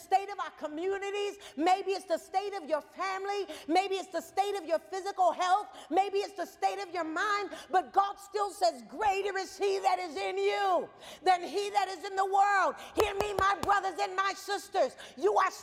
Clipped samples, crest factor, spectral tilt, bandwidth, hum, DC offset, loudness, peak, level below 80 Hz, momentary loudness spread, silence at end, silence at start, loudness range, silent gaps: under 0.1%; 22 dB; -3 dB/octave; 16 kHz; none; under 0.1%; -31 LUFS; -10 dBFS; -64 dBFS; 7 LU; 0 s; 0 s; 3 LU; none